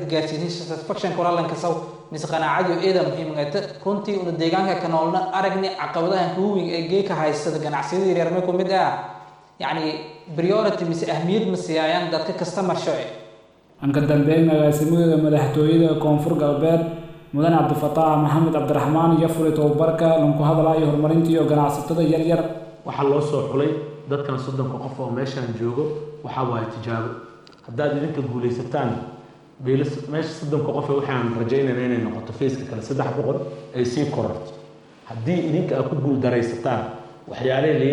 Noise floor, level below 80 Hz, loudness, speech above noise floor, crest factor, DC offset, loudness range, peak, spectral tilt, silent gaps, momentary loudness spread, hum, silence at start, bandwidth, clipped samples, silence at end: -50 dBFS; -58 dBFS; -22 LUFS; 30 dB; 14 dB; under 0.1%; 8 LU; -6 dBFS; -7 dB/octave; none; 11 LU; none; 0 s; 15 kHz; under 0.1%; 0 s